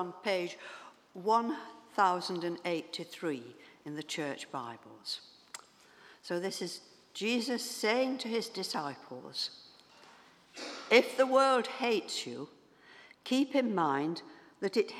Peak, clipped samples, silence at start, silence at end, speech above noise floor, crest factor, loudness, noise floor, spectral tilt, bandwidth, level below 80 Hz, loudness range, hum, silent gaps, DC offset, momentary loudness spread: -10 dBFS; under 0.1%; 0 s; 0 s; 27 dB; 26 dB; -33 LUFS; -60 dBFS; -3.5 dB/octave; 15.5 kHz; -88 dBFS; 9 LU; none; none; under 0.1%; 20 LU